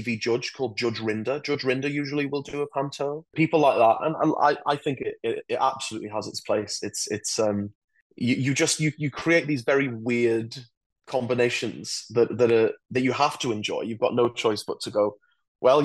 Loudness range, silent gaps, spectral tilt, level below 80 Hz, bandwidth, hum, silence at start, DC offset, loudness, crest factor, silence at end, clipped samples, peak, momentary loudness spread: 4 LU; 7.75-7.88 s, 8.02-8.10 s, 10.77-10.90 s, 15.48-15.55 s; -4.5 dB/octave; -68 dBFS; 12.5 kHz; none; 0 s; under 0.1%; -25 LUFS; 18 dB; 0 s; under 0.1%; -8 dBFS; 9 LU